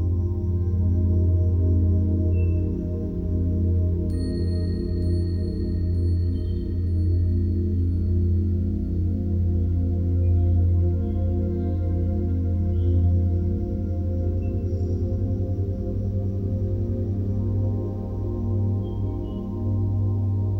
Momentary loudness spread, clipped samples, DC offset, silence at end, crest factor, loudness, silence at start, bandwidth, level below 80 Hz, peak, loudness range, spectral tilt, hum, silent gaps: 6 LU; under 0.1%; under 0.1%; 0 s; 10 dB; -24 LUFS; 0 s; 4.6 kHz; -30 dBFS; -12 dBFS; 3 LU; -11 dB/octave; none; none